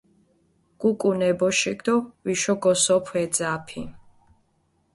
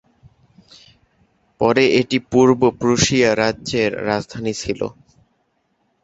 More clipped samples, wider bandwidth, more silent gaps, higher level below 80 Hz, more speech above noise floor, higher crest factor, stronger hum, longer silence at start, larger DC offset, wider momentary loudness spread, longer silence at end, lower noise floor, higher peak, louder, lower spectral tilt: neither; first, 11.5 kHz vs 8 kHz; neither; second, -60 dBFS vs -48 dBFS; second, 45 dB vs 49 dB; about the same, 18 dB vs 18 dB; neither; second, 0.8 s vs 1.6 s; neither; about the same, 10 LU vs 10 LU; second, 0.95 s vs 1.1 s; about the same, -67 dBFS vs -66 dBFS; second, -8 dBFS vs 0 dBFS; second, -23 LUFS vs -18 LUFS; about the same, -3.5 dB/octave vs -4.5 dB/octave